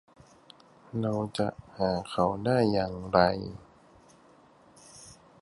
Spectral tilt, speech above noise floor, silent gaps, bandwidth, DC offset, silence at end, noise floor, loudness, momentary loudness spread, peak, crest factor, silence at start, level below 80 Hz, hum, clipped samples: -6.5 dB/octave; 30 dB; none; 11.5 kHz; under 0.1%; 0.3 s; -58 dBFS; -29 LUFS; 24 LU; -6 dBFS; 24 dB; 0.95 s; -56 dBFS; none; under 0.1%